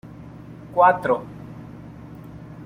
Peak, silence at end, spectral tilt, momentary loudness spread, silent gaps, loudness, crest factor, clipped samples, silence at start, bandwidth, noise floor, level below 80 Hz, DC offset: -4 dBFS; 0 s; -7.5 dB/octave; 24 LU; none; -20 LUFS; 20 dB; under 0.1%; 0.05 s; 15.5 kHz; -40 dBFS; -54 dBFS; under 0.1%